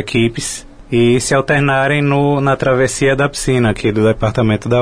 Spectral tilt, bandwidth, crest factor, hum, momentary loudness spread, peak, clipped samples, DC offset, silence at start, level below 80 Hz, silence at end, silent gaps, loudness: -5.5 dB/octave; 11 kHz; 10 dB; none; 4 LU; -2 dBFS; under 0.1%; 0.7%; 0 s; -36 dBFS; 0 s; none; -14 LUFS